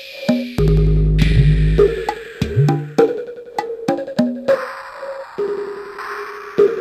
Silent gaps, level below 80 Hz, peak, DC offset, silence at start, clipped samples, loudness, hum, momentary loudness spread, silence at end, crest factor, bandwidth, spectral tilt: none; -24 dBFS; 0 dBFS; under 0.1%; 0 s; under 0.1%; -18 LUFS; none; 14 LU; 0 s; 16 dB; 13.5 kHz; -8 dB/octave